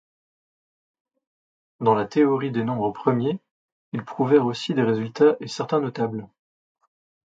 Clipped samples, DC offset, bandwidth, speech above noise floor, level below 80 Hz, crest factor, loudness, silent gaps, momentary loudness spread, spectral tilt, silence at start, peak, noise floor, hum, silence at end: under 0.1%; under 0.1%; 7.8 kHz; over 68 dB; -68 dBFS; 20 dB; -23 LUFS; 3.51-3.92 s; 11 LU; -7 dB/octave; 1.8 s; -4 dBFS; under -90 dBFS; none; 1 s